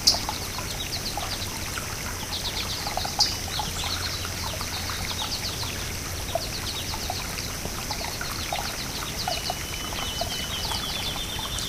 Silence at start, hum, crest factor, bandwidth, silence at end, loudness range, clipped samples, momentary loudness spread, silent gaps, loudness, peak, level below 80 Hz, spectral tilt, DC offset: 0 s; none; 26 dB; 16 kHz; 0 s; 2 LU; under 0.1%; 4 LU; none; -28 LUFS; -4 dBFS; -40 dBFS; -2 dB/octave; under 0.1%